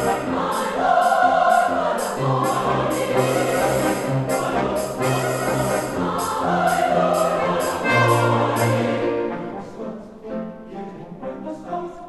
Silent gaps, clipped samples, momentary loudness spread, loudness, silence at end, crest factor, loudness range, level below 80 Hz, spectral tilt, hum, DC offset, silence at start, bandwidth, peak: none; under 0.1%; 16 LU; -20 LUFS; 0 s; 16 dB; 4 LU; -50 dBFS; -5 dB/octave; none; under 0.1%; 0 s; 14 kHz; -4 dBFS